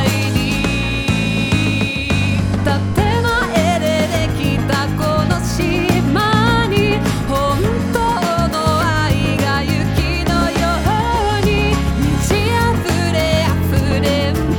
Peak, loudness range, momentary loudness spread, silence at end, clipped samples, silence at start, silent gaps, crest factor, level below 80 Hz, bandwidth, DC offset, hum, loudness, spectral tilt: 0 dBFS; 1 LU; 2 LU; 0 s; under 0.1%; 0 s; none; 14 dB; -26 dBFS; 20 kHz; under 0.1%; none; -16 LUFS; -5.5 dB/octave